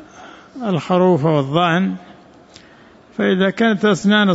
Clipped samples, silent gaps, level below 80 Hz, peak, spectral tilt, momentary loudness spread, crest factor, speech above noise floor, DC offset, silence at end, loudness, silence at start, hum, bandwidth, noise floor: under 0.1%; none; -58 dBFS; -4 dBFS; -6.5 dB/octave; 13 LU; 14 dB; 30 dB; under 0.1%; 0 s; -16 LUFS; 0 s; none; 8 kHz; -46 dBFS